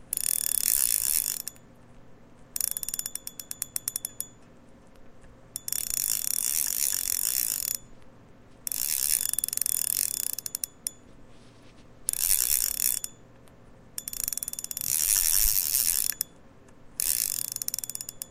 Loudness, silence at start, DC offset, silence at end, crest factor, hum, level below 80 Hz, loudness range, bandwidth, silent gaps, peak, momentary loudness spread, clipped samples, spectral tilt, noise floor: -26 LUFS; 0 s; 0.1%; 0 s; 28 dB; none; -50 dBFS; 9 LU; 16.5 kHz; none; -2 dBFS; 14 LU; under 0.1%; 1 dB/octave; -53 dBFS